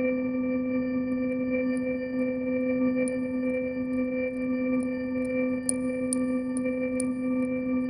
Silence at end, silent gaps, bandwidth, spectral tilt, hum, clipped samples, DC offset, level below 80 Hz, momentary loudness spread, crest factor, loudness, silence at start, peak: 0 s; none; 11 kHz; -5.5 dB/octave; none; under 0.1%; under 0.1%; -58 dBFS; 2 LU; 18 dB; -28 LUFS; 0 s; -10 dBFS